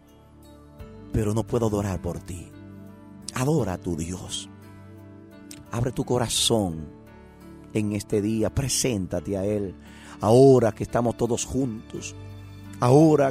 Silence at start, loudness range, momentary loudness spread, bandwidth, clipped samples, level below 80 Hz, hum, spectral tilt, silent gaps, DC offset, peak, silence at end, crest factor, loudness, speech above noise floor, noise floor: 0.5 s; 8 LU; 25 LU; 16 kHz; under 0.1%; -46 dBFS; none; -5.5 dB/octave; none; under 0.1%; -6 dBFS; 0 s; 20 dB; -24 LUFS; 27 dB; -50 dBFS